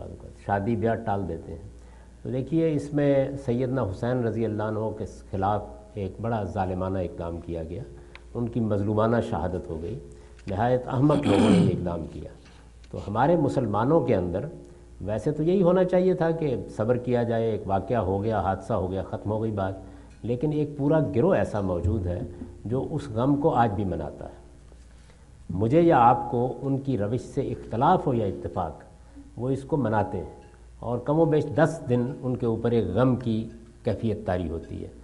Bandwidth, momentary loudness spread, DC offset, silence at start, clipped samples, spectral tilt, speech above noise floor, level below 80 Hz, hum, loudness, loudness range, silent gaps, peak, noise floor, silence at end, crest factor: 11.5 kHz; 15 LU; under 0.1%; 0 s; under 0.1%; -8.5 dB/octave; 25 dB; -48 dBFS; none; -26 LUFS; 5 LU; none; -6 dBFS; -50 dBFS; 0 s; 20 dB